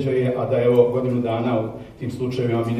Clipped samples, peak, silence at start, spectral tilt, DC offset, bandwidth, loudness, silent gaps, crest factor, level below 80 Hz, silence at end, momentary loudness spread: under 0.1%; -4 dBFS; 0 s; -8.5 dB/octave; under 0.1%; 11 kHz; -21 LUFS; none; 18 dB; -52 dBFS; 0 s; 13 LU